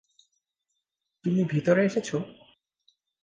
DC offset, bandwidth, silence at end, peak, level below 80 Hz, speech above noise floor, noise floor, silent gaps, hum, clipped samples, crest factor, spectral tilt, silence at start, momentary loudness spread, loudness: under 0.1%; 9.4 kHz; 0.9 s; -8 dBFS; -70 dBFS; 58 dB; -83 dBFS; none; none; under 0.1%; 20 dB; -7 dB/octave; 1.25 s; 11 LU; -26 LUFS